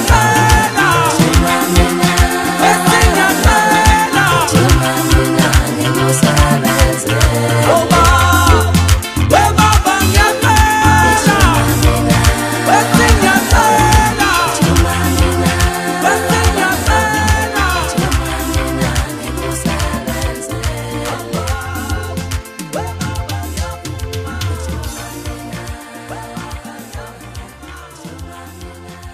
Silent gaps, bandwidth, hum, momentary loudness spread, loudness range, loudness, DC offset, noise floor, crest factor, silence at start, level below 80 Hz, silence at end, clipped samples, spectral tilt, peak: none; 16 kHz; none; 18 LU; 14 LU; -12 LUFS; 0.2%; -33 dBFS; 12 dB; 0 s; -20 dBFS; 0 s; under 0.1%; -4.5 dB/octave; 0 dBFS